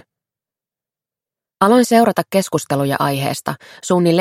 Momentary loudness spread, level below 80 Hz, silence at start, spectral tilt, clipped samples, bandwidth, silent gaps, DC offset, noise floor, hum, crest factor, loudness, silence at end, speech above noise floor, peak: 11 LU; -62 dBFS; 1.6 s; -5.5 dB/octave; under 0.1%; 16.5 kHz; none; under 0.1%; -89 dBFS; none; 18 dB; -16 LUFS; 0 s; 74 dB; 0 dBFS